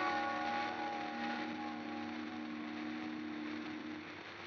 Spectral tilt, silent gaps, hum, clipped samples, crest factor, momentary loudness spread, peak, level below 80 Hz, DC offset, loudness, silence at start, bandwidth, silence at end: -4.5 dB/octave; none; none; under 0.1%; 16 dB; 7 LU; -24 dBFS; -82 dBFS; under 0.1%; -42 LUFS; 0 s; 7.2 kHz; 0 s